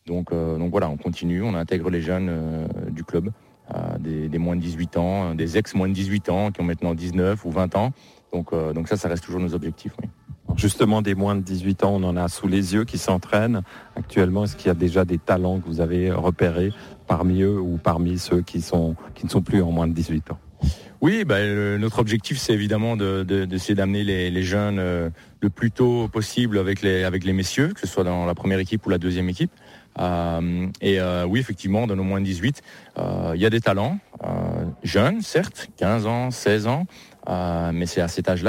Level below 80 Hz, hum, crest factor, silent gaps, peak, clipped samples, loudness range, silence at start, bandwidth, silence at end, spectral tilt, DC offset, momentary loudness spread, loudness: -42 dBFS; none; 18 dB; none; -6 dBFS; under 0.1%; 3 LU; 0.05 s; 16 kHz; 0 s; -6.5 dB/octave; under 0.1%; 7 LU; -23 LUFS